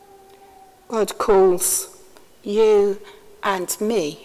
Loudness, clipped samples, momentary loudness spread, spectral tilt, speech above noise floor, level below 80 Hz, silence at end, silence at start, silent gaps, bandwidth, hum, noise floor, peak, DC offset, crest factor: -19 LUFS; under 0.1%; 13 LU; -3.5 dB/octave; 31 dB; -52 dBFS; 0.1 s; 0.9 s; none; 16 kHz; none; -49 dBFS; -4 dBFS; under 0.1%; 16 dB